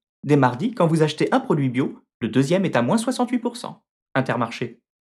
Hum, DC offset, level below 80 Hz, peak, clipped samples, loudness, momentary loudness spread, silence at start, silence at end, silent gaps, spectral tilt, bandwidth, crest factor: none; under 0.1%; -68 dBFS; -4 dBFS; under 0.1%; -22 LUFS; 11 LU; 0.25 s; 0.3 s; 2.14-2.20 s, 3.89-4.06 s; -6.5 dB/octave; 13 kHz; 18 dB